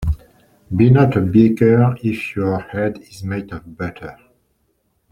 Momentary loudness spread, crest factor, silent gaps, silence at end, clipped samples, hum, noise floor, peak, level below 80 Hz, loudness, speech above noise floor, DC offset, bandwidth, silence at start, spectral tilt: 16 LU; 16 dB; none; 1 s; under 0.1%; none; -65 dBFS; -2 dBFS; -38 dBFS; -17 LUFS; 49 dB; under 0.1%; 11 kHz; 0 s; -9 dB/octave